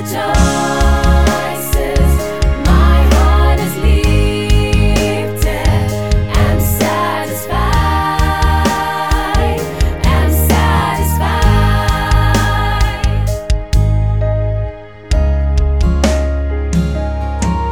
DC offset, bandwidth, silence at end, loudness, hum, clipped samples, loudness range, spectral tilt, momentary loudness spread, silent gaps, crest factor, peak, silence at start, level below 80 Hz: 1%; 18.5 kHz; 0 s; -14 LUFS; none; under 0.1%; 3 LU; -5.5 dB/octave; 6 LU; none; 12 dB; 0 dBFS; 0 s; -14 dBFS